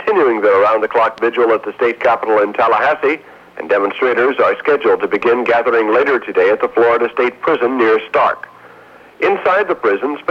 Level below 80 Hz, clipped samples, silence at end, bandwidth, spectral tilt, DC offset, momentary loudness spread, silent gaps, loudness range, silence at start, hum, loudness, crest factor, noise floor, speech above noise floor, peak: -58 dBFS; under 0.1%; 0.1 s; 6.8 kHz; -6 dB/octave; under 0.1%; 4 LU; none; 2 LU; 0 s; none; -14 LUFS; 12 dB; -41 dBFS; 27 dB; -2 dBFS